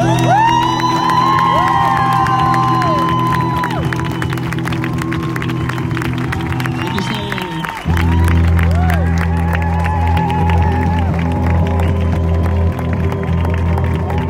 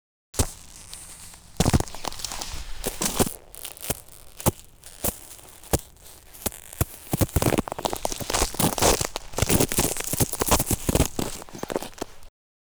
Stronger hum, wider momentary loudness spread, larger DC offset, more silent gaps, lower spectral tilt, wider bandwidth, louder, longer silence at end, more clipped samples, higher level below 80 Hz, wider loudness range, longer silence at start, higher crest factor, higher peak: neither; second, 7 LU vs 19 LU; neither; neither; first, -6.5 dB/octave vs -3.5 dB/octave; second, 15.5 kHz vs over 20 kHz; first, -15 LUFS vs -26 LUFS; second, 0 s vs 0.35 s; neither; first, -24 dBFS vs -36 dBFS; about the same, 5 LU vs 7 LU; second, 0 s vs 0.35 s; second, 12 dB vs 22 dB; about the same, -2 dBFS vs -4 dBFS